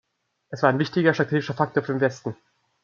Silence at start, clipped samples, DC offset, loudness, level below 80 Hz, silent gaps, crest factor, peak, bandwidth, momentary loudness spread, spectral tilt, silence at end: 0.5 s; under 0.1%; under 0.1%; -23 LUFS; -68 dBFS; none; 22 dB; -2 dBFS; 7.4 kHz; 14 LU; -7 dB/octave; 0.5 s